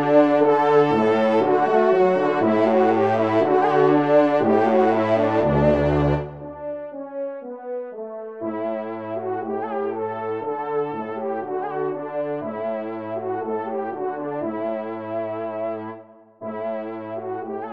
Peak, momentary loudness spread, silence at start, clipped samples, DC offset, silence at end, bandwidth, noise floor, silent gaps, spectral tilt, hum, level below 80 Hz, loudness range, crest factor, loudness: -4 dBFS; 14 LU; 0 s; under 0.1%; 0.1%; 0 s; 7.6 kHz; -43 dBFS; none; -8.5 dB/octave; none; -46 dBFS; 11 LU; 18 dB; -22 LUFS